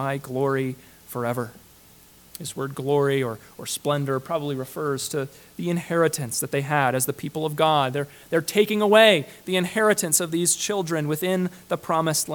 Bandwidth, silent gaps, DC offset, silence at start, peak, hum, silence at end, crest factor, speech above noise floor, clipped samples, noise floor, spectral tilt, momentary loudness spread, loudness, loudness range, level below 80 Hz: 19 kHz; none; under 0.1%; 0 s; -2 dBFS; none; 0 s; 22 dB; 28 dB; under 0.1%; -52 dBFS; -4 dB/octave; 11 LU; -23 LUFS; 7 LU; -64 dBFS